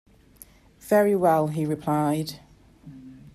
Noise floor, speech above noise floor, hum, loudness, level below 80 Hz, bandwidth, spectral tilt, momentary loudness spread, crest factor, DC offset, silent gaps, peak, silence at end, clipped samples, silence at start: -52 dBFS; 30 dB; none; -23 LUFS; -60 dBFS; 14.5 kHz; -7 dB/octave; 25 LU; 18 dB; under 0.1%; none; -8 dBFS; 0.2 s; under 0.1%; 0.85 s